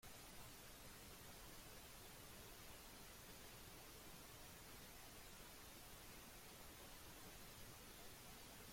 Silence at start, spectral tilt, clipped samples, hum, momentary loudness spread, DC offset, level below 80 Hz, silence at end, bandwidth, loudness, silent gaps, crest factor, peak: 0 s; -2.5 dB/octave; under 0.1%; none; 0 LU; under 0.1%; -68 dBFS; 0 s; 16.5 kHz; -59 LUFS; none; 14 dB; -46 dBFS